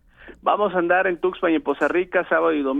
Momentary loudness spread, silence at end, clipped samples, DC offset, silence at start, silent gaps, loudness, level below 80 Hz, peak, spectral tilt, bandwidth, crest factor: 3 LU; 0 s; under 0.1%; under 0.1%; 0.2 s; none; -21 LUFS; -54 dBFS; -6 dBFS; -6.5 dB/octave; 8 kHz; 16 dB